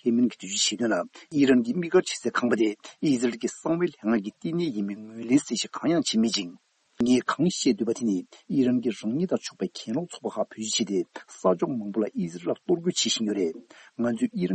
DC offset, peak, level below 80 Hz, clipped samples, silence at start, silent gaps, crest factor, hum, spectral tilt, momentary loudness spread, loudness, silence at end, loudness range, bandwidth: under 0.1%; -8 dBFS; -70 dBFS; under 0.1%; 0.05 s; none; 18 dB; none; -4.5 dB/octave; 8 LU; -26 LUFS; 0 s; 3 LU; 8.8 kHz